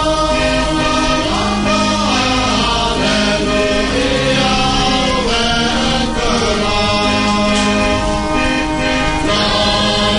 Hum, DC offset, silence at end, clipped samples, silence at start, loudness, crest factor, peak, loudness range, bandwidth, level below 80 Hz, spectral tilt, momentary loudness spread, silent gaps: none; under 0.1%; 0 s; under 0.1%; 0 s; -14 LUFS; 12 dB; -2 dBFS; 1 LU; 11 kHz; -26 dBFS; -4 dB/octave; 2 LU; none